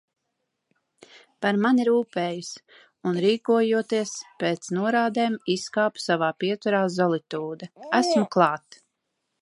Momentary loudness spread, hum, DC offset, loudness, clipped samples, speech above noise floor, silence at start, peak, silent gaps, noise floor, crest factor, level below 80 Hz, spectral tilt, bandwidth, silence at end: 11 LU; none; under 0.1%; -24 LUFS; under 0.1%; 55 dB; 1.4 s; -4 dBFS; none; -79 dBFS; 22 dB; -76 dBFS; -5 dB/octave; 11.5 kHz; 0.85 s